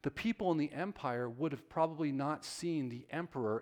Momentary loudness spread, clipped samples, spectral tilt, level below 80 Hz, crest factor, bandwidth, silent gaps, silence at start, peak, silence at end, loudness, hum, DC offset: 5 LU; under 0.1%; -6 dB/octave; -68 dBFS; 18 dB; 17 kHz; none; 0.05 s; -18 dBFS; 0 s; -37 LUFS; none; under 0.1%